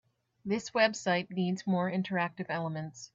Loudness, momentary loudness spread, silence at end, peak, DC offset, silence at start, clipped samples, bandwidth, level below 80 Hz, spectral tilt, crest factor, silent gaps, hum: -32 LUFS; 9 LU; 0.1 s; -12 dBFS; under 0.1%; 0.45 s; under 0.1%; 7.8 kHz; -76 dBFS; -5.5 dB/octave; 20 dB; none; none